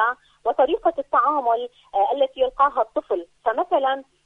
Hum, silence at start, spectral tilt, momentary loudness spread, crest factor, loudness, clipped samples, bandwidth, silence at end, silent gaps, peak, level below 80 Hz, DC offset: none; 0 s; -4.5 dB/octave; 6 LU; 16 dB; -22 LUFS; under 0.1%; 4.1 kHz; 0.25 s; none; -6 dBFS; -58 dBFS; under 0.1%